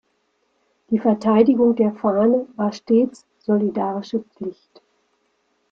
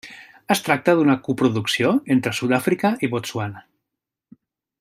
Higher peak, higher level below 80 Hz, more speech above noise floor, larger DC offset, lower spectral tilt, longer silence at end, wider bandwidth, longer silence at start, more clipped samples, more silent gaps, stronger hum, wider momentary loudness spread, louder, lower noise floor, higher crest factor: about the same, -2 dBFS vs -2 dBFS; about the same, -64 dBFS vs -64 dBFS; second, 49 dB vs 64 dB; neither; first, -8 dB/octave vs -5 dB/octave; about the same, 1.2 s vs 1.2 s; second, 7.4 kHz vs 16 kHz; first, 0.9 s vs 0.05 s; neither; neither; neither; about the same, 13 LU vs 11 LU; about the same, -19 LUFS vs -20 LUFS; second, -68 dBFS vs -84 dBFS; about the same, 18 dB vs 20 dB